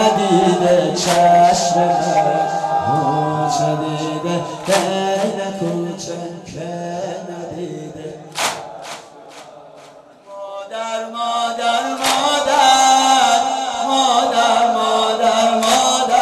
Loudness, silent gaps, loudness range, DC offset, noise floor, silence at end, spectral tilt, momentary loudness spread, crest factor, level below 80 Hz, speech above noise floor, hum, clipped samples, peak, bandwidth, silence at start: -16 LUFS; none; 13 LU; under 0.1%; -42 dBFS; 0 s; -3.5 dB/octave; 17 LU; 14 dB; -56 dBFS; 26 dB; none; under 0.1%; -2 dBFS; 13 kHz; 0 s